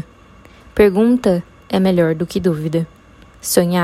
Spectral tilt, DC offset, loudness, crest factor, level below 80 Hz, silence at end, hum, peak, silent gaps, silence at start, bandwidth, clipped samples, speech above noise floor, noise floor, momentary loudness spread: -6 dB/octave; under 0.1%; -16 LUFS; 16 dB; -42 dBFS; 0 s; none; 0 dBFS; none; 0.75 s; 15.5 kHz; under 0.1%; 29 dB; -44 dBFS; 12 LU